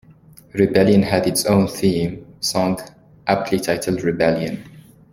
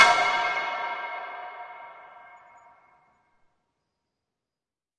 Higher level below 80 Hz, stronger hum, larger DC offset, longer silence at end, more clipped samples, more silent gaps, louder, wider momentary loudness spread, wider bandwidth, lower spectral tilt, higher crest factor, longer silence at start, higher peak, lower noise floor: first, -50 dBFS vs -74 dBFS; neither; neither; second, 0.35 s vs 2.6 s; neither; neither; first, -19 LUFS vs -26 LUFS; second, 13 LU vs 23 LU; first, 16.5 kHz vs 11 kHz; first, -5.5 dB/octave vs -0.5 dB/octave; second, 18 dB vs 28 dB; first, 0.55 s vs 0 s; about the same, -2 dBFS vs -2 dBFS; second, -47 dBFS vs under -90 dBFS